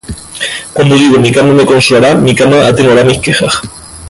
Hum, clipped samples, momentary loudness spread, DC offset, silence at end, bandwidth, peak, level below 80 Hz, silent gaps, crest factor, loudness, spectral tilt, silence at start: none; under 0.1%; 11 LU; under 0.1%; 0 s; 11.5 kHz; 0 dBFS; -36 dBFS; none; 8 dB; -7 LUFS; -5 dB/octave; 0.1 s